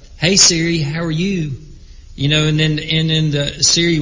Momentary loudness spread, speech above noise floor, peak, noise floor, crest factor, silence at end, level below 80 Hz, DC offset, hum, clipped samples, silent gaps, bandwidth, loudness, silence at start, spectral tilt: 12 LU; 21 dB; 0 dBFS; -36 dBFS; 16 dB; 0 s; -38 dBFS; under 0.1%; none; under 0.1%; none; 8 kHz; -14 LUFS; 0 s; -3.5 dB/octave